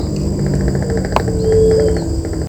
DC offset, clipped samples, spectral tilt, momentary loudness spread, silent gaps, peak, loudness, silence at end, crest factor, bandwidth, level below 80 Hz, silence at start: under 0.1%; under 0.1%; -7 dB/octave; 7 LU; none; 0 dBFS; -15 LUFS; 0 s; 14 dB; over 20 kHz; -24 dBFS; 0 s